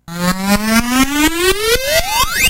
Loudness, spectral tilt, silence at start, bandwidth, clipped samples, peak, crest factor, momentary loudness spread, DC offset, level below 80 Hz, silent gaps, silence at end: -13 LUFS; -3 dB/octave; 0.1 s; 16 kHz; under 0.1%; -2 dBFS; 12 dB; 3 LU; under 0.1%; -28 dBFS; none; 0 s